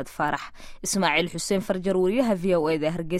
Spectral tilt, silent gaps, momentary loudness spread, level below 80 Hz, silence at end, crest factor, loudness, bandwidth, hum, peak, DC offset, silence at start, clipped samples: -4.5 dB/octave; none; 7 LU; -48 dBFS; 0 s; 18 dB; -24 LUFS; 16 kHz; none; -8 dBFS; under 0.1%; 0 s; under 0.1%